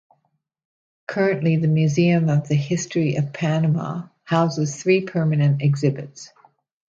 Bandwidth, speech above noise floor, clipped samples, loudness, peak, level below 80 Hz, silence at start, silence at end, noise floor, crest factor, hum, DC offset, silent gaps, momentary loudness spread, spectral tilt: 7.8 kHz; 51 dB; under 0.1%; -21 LUFS; -6 dBFS; -64 dBFS; 1.1 s; 0.65 s; -71 dBFS; 16 dB; none; under 0.1%; none; 12 LU; -7 dB/octave